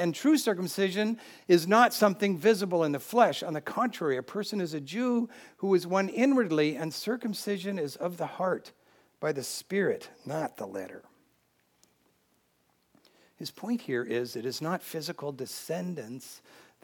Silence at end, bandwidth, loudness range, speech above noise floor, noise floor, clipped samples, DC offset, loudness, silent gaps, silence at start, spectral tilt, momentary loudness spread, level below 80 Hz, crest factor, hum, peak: 0.45 s; 19 kHz; 12 LU; 42 dB; -71 dBFS; under 0.1%; under 0.1%; -29 LUFS; none; 0 s; -5 dB/octave; 13 LU; -86 dBFS; 22 dB; none; -8 dBFS